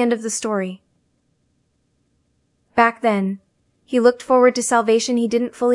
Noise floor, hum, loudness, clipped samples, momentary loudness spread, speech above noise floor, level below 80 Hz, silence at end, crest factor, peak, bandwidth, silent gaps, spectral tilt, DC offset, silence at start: -66 dBFS; none; -18 LUFS; under 0.1%; 9 LU; 49 dB; -64 dBFS; 0 s; 18 dB; -2 dBFS; 12 kHz; none; -4 dB/octave; under 0.1%; 0 s